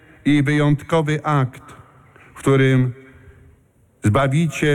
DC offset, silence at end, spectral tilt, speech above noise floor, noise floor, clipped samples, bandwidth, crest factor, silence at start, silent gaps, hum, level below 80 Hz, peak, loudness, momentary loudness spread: under 0.1%; 0 s; -7 dB/octave; 38 dB; -55 dBFS; under 0.1%; 13 kHz; 12 dB; 0.25 s; none; none; -48 dBFS; -8 dBFS; -18 LUFS; 8 LU